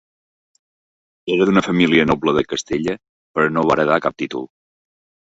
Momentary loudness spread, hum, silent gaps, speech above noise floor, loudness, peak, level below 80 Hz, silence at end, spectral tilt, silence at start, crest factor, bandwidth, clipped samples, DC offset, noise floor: 13 LU; none; 3.09-3.34 s; over 73 dB; -18 LUFS; -2 dBFS; -50 dBFS; 0.8 s; -5.5 dB/octave; 1.25 s; 18 dB; 8 kHz; under 0.1%; under 0.1%; under -90 dBFS